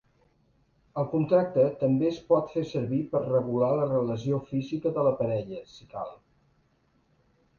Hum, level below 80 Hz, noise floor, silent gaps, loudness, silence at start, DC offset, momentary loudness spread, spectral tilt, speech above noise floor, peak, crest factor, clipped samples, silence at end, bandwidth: none; -62 dBFS; -68 dBFS; none; -27 LUFS; 0.95 s; under 0.1%; 14 LU; -9 dB/octave; 41 dB; -10 dBFS; 18 dB; under 0.1%; 1.45 s; 7 kHz